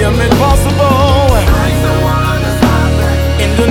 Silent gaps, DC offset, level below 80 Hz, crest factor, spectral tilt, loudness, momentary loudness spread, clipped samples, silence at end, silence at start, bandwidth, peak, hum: none; 0.8%; -16 dBFS; 10 dB; -6 dB/octave; -11 LUFS; 3 LU; under 0.1%; 0 s; 0 s; 18 kHz; 0 dBFS; none